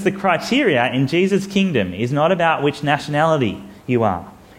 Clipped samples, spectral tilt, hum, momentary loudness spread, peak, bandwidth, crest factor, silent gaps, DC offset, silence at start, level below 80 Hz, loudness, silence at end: under 0.1%; -6 dB/octave; none; 5 LU; -2 dBFS; 15.5 kHz; 16 dB; none; under 0.1%; 0 s; -52 dBFS; -18 LUFS; 0.25 s